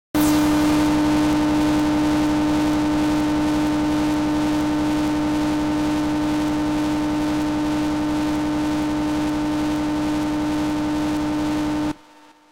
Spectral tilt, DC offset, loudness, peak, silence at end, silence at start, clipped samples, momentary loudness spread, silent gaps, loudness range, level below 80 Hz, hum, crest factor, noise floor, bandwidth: -5.5 dB/octave; under 0.1%; -21 LUFS; -10 dBFS; 0.55 s; 0.15 s; under 0.1%; 4 LU; none; 3 LU; -38 dBFS; none; 10 dB; -49 dBFS; 16.5 kHz